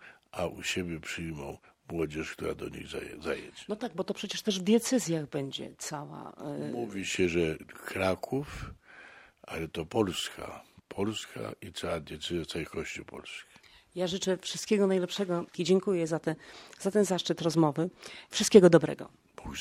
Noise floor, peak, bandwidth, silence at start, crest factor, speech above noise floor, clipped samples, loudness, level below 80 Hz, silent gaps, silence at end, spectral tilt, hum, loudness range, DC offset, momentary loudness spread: -54 dBFS; -4 dBFS; 16 kHz; 0 s; 26 dB; 23 dB; under 0.1%; -31 LUFS; -58 dBFS; none; 0 s; -5 dB/octave; none; 10 LU; under 0.1%; 17 LU